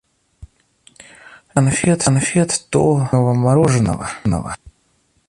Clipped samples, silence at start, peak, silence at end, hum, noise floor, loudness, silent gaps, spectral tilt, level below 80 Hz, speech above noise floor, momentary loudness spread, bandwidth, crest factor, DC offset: under 0.1%; 0.4 s; -2 dBFS; 0.6 s; none; -61 dBFS; -16 LUFS; none; -5.5 dB/octave; -42 dBFS; 46 dB; 8 LU; 11.5 kHz; 16 dB; under 0.1%